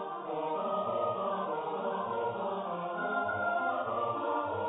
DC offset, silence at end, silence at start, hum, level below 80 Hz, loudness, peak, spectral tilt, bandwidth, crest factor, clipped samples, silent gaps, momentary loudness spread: under 0.1%; 0 s; 0 s; none; -70 dBFS; -34 LUFS; -20 dBFS; -1 dB/octave; 3.9 kHz; 14 dB; under 0.1%; none; 4 LU